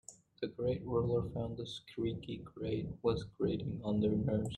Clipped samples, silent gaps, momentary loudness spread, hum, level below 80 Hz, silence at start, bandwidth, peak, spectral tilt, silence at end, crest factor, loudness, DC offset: under 0.1%; none; 11 LU; none; -56 dBFS; 0.1 s; 10.5 kHz; -20 dBFS; -7.5 dB/octave; 0 s; 18 dB; -37 LUFS; under 0.1%